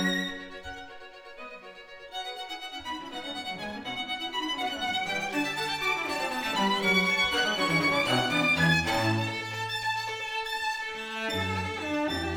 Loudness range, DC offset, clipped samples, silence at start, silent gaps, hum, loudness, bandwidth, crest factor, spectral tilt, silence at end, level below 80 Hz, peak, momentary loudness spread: 12 LU; under 0.1%; under 0.1%; 0 s; none; none; -28 LUFS; over 20 kHz; 18 dB; -4 dB/octave; 0 s; -58 dBFS; -10 dBFS; 18 LU